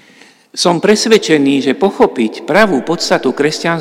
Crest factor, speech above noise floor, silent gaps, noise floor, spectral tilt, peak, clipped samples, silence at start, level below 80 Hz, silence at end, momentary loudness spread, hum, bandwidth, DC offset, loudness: 12 dB; 32 dB; none; -44 dBFS; -4 dB/octave; 0 dBFS; 0.5%; 0.55 s; -52 dBFS; 0 s; 5 LU; none; 16 kHz; under 0.1%; -12 LUFS